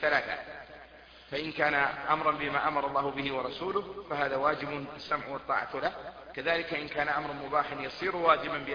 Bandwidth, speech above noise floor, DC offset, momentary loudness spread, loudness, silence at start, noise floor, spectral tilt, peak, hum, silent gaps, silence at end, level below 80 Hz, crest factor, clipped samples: 5.2 kHz; 21 dB; under 0.1%; 11 LU; -31 LUFS; 0 s; -53 dBFS; -6 dB/octave; -8 dBFS; none; none; 0 s; -60 dBFS; 22 dB; under 0.1%